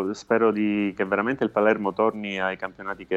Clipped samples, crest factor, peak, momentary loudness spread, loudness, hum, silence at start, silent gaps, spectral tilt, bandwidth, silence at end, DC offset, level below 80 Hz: under 0.1%; 16 dB; -8 dBFS; 8 LU; -24 LUFS; none; 0 s; none; -6.5 dB/octave; 8 kHz; 0 s; under 0.1%; -62 dBFS